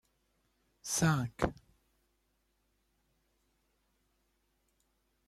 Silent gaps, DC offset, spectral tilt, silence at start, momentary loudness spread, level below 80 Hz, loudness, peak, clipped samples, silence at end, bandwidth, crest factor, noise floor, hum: none; under 0.1%; -4.5 dB/octave; 0.85 s; 8 LU; -58 dBFS; -33 LUFS; -16 dBFS; under 0.1%; 3.75 s; 14 kHz; 26 dB; -78 dBFS; none